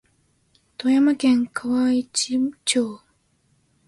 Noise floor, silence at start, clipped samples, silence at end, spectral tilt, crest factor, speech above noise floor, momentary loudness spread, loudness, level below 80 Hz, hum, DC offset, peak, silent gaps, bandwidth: -65 dBFS; 0.8 s; under 0.1%; 0.9 s; -2.5 dB/octave; 16 dB; 44 dB; 8 LU; -21 LUFS; -64 dBFS; none; under 0.1%; -6 dBFS; none; 11.5 kHz